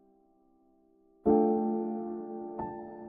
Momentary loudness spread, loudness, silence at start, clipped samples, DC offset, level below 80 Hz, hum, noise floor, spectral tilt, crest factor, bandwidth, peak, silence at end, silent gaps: 14 LU; -31 LUFS; 1.25 s; under 0.1%; under 0.1%; -64 dBFS; none; -66 dBFS; -11.5 dB/octave; 20 dB; 2.5 kHz; -12 dBFS; 0 s; none